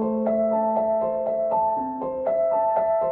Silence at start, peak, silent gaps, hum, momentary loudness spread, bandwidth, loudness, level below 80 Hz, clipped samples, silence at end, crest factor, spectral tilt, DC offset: 0 s; -12 dBFS; none; none; 4 LU; 2.8 kHz; -23 LUFS; -58 dBFS; under 0.1%; 0 s; 12 dB; -11.5 dB/octave; under 0.1%